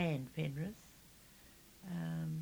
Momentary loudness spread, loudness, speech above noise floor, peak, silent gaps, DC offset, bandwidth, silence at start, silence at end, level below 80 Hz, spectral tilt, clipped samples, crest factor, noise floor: 19 LU; -42 LUFS; 20 dB; -22 dBFS; none; under 0.1%; over 20 kHz; 0 s; 0 s; -68 dBFS; -7 dB/octave; under 0.1%; 20 dB; -62 dBFS